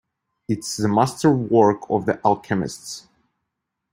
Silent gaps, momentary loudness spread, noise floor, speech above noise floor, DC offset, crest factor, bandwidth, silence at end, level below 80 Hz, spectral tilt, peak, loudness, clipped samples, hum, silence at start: none; 16 LU; -80 dBFS; 60 dB; under 0.1%; 20 dB; 16 kHz; 0.95 s; -58 dBFS; -6 dB/octave; -2 dBFS; -20 LUFS; under 0.1%; none; 0.5 s